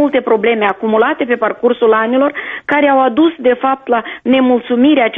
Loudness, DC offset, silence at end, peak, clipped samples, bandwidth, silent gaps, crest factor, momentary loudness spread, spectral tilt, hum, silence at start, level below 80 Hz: -13 LUFS; under 0.1%; 0 s; 0 dBFS; under 0.1%; 3.9 kHz; none; 12 dB; 5 LU; -7.5 dB/octave; none; 0 s; -56 dBFS